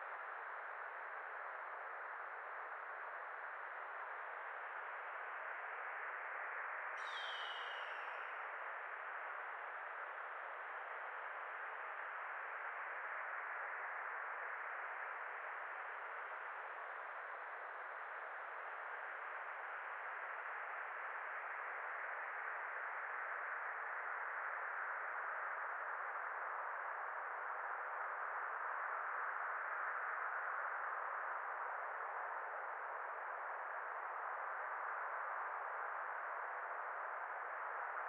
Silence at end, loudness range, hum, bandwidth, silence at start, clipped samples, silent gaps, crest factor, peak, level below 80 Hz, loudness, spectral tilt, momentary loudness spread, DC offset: 0 s; 5 LU; none; 4.6 kHz; 0 s; under 0.1%; none; 16 dB; -32 dBFS; under -90 dBFS; -45 LUFS; 7 dB/octave; 5 LU; under 0.1%